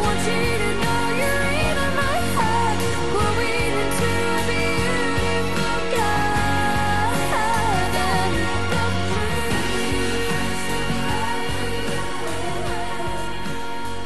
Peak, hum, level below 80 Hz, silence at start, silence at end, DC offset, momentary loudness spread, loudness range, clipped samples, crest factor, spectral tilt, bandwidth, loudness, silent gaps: -8 dBFS; none; -36 dBFS; 0 s; 0 s; 6%; 6 LU; 4 LU; under 0.1%; 14 dB; -4.5 dB/octave; 12.5 kHz; -22 LUFS; none